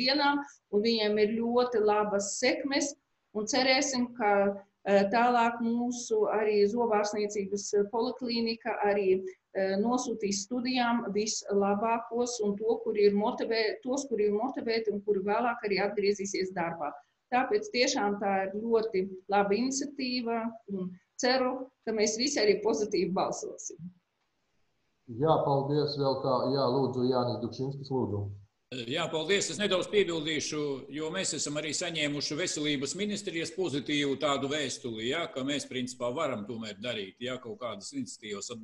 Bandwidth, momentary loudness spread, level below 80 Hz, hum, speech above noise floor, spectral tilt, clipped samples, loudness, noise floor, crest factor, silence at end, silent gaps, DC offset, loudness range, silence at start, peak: 11 kHz; 10 LU; -68 dBFS; none; 49 dB; -4 dB/octave; under 0.1%; -30 LUFS; -78 dBFS; 18 dB; 0 s; none; under 0.1%; 4 LU; 0 s; -12 dBFS